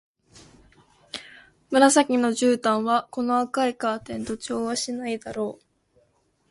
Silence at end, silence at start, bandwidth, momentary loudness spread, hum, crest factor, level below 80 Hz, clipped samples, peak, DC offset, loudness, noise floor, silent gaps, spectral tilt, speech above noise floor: 0.95 s; 1.15 s; 11.5 kHz; 15 LU; none; 22 dB; -62 dBFS; under 0.1%; -4 dBFS; under 0.1%; -23 LUFS; -66 dBFS; none; -3 dB/octave; 43 dB